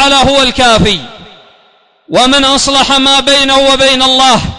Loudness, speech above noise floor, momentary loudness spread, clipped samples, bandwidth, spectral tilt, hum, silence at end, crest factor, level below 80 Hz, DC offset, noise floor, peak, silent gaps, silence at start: -6 LUFS; 40 dB; 4 LU; under 0.1%; 11 kHz; -2.5 dB/octave; none; 0 s; 8 dB; -30 dBFS; under 0.1%; -47 dBFS; 0 dBFS; none; 0 s